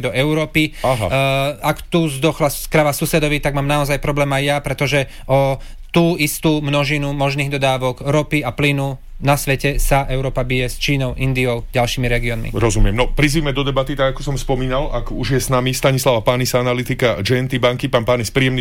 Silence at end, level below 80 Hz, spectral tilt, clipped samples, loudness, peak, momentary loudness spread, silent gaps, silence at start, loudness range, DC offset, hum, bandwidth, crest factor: 0 s; -26 dBFS; -5 dB/octave; under 0.1%; -17 LUFS; -4 dBFS; 4 LU; none; 0 s; 1 LU; 0.5%; none; 17 kHz; 14 dB